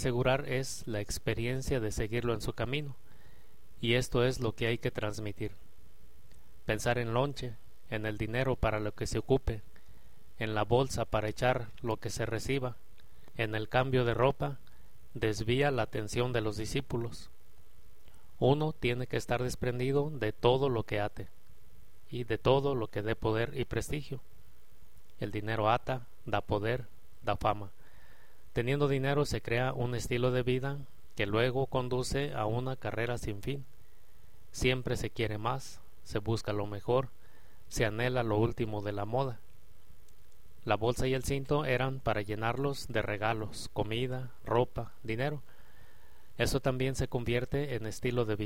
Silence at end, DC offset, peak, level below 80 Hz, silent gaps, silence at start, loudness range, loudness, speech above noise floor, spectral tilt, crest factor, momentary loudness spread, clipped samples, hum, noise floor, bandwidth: 0 s; 0.9%; -12 dBFS; -48 dBFS; none; 0 s; 3 LU; -33 LUFS; 28 dB; -5.5 dB/octave; 22 dB; 10 LU; under 0.1%; none; -60 dBFS; 16.5 kHz